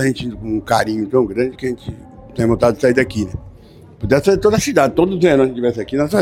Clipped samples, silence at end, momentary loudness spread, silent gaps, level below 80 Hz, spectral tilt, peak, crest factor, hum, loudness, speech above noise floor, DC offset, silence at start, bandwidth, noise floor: under 0.1%; 0 s; 14 LU; none; -40 dBFS; -6 dB/octave; 0 dBFS; 16 dB; none; -16 LUFS; 26 dB; under 0.1%; 0 s; 16.5 kHz; -41 dBFS